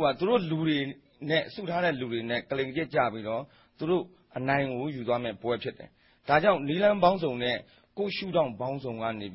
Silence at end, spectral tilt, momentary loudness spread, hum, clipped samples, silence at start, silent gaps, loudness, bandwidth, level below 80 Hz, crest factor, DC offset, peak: 0 s; -10 dB/octave; 11 LU; none; under 0.1%; 0 s; none; -29 LUFS; 5.8 kHz; -62 dBFS; 20 dB; under 0.1%; -8 dBFS